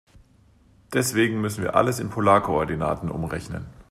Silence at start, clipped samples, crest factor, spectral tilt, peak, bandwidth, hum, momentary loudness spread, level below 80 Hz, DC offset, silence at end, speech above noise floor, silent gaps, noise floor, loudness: 0.9 s; under 0.1%; 22 dB; -5.5 dB/octave; -2 dBFS; 15.5 kHz; none; 11 LU; -48 dBFS; under 0.1%; 0.1 s; 34 dB; none; -57 dBFS; -23 LUFS